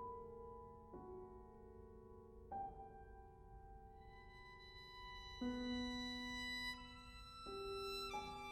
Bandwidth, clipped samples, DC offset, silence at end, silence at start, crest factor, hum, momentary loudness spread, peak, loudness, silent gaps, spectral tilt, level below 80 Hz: 16 kHz; under 0.1%; under 0.1%; 0 s; 0 s; 16 dB; none; 16 LU; -36 dBFS; -50 LUFS; none; -4 dB/octave; -64 dBFS